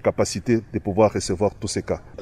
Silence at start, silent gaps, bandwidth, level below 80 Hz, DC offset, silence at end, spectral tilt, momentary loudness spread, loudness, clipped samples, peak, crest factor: 0.05 s; none; 14 kHz; -46 dBFS; under 0.1%; 0 s; -5.5 dB/octave; 7 LU; -23 LUFS; under 0.1%; -4 dBFS; 18 dB